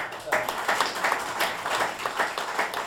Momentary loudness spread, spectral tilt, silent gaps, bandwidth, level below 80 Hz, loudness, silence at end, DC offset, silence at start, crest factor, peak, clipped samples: 3 LU; -1 dB/octave; none; 19 kHz; -64 dBFS; -27 LUFS; 0 s; under 0.1%; 0 s; 20 dB; -8 dBFS; under 0.1%